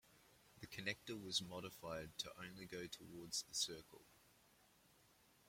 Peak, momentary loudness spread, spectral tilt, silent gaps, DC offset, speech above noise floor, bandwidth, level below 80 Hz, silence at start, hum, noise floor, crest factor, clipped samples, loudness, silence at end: -26 dBFS; 12 LU; -2 dB/octave; none; under 0.1%; 24 dB; 16.5 kHz; -76 dBFS; 0.05 s; none; -73 dBFS; 24 dB; under 0.1%; -47 LUFS; 0 s